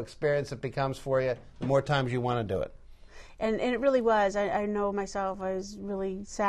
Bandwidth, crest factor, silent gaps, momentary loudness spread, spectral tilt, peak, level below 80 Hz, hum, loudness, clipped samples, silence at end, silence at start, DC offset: 12.5 kHz; 16 dB; none; 9 LU; -6 dB/octave; -14 dBFS; -52 dBFS; none; -30 LUFS; under 0.1%; 0 s; 0 s; under 0.1%